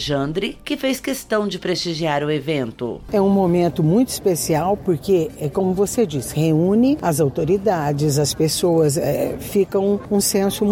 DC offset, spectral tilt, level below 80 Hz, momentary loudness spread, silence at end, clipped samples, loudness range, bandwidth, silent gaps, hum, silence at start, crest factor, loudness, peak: under 0.1%; -5.5 dB/octave; -44 dBFS; 6 LU; 0 s; under 0.1%; 2 LU; 18 kHz; none; none; 0 s; 12 dB; -19 LUFS; -6 dBFS